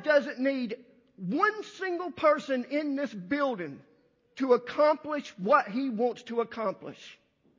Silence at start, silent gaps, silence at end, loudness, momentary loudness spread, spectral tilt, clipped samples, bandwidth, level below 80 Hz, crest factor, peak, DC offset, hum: 0 s; none; 0.45 s; -29 LUFS; 16 LU; -6 dB/octave; under 0.1%; 7.6 kHz; -76 dBFS; 20 dB; -10 dBFS; under 0.1%; none